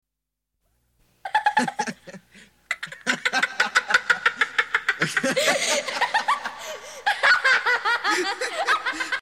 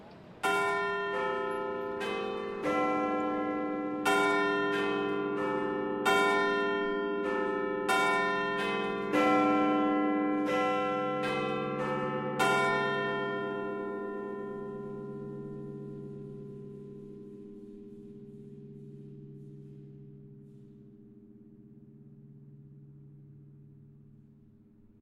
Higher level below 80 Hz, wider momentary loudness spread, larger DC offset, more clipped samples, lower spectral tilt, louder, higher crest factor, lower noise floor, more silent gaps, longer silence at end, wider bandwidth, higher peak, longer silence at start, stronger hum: about the same, -68 dBFS vs -68 dBFS; second, 12 LU vs 22 LU; neither; neither; second, -1.5 dB/octave vs -5 dB/octave; first, -22 LUFS vs -30 LUFS; about the same, 20 dB vs 18 dB; first, -84 dBFS vs -59 dBFS; neither; second, 0 s vs 1.05 s; about the same, 16.5 kHz vs 16 kHz; first, -4 dBFS vs -14 dBFS; first, 1.25 s vs 0 s; neither